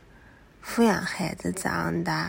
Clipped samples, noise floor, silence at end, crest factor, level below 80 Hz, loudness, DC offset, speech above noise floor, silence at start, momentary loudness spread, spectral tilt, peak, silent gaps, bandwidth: under 0.1%; -53 dBFS; 0 s; 18 dB; -54 dBFS; -27 LUFS; under 0.1%; 27 dB; 0.15 s; 8 LU; -5 dB/octave; -10 dBFS; none; 16.5 kHz